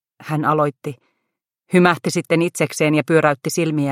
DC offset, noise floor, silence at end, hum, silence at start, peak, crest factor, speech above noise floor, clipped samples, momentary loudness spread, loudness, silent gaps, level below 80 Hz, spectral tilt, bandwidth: under 0.1%; -78 dBFS; 0 s; none; 0.2 s; 0 dBFS; 18 dB; 61 dB; under 0.1%; 7 LU; -18 LUFS; none; -64 dBFS; -5.5 dB/octave; 16 kHz